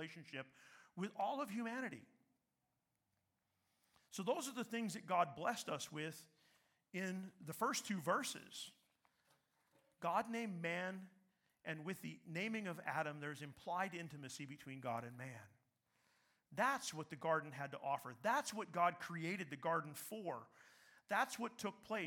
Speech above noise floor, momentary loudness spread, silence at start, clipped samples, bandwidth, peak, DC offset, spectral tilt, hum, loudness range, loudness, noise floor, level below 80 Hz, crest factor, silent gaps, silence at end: 44 dB; 13 LU; 0 s; under 0.1%; 18 kHz; -24 dBFS; under 0.1%; -4 dB/octave; none; 7 LU; -44 LUFS; -88 dBFS; -90 dBFS; 22 dB; none; 0 s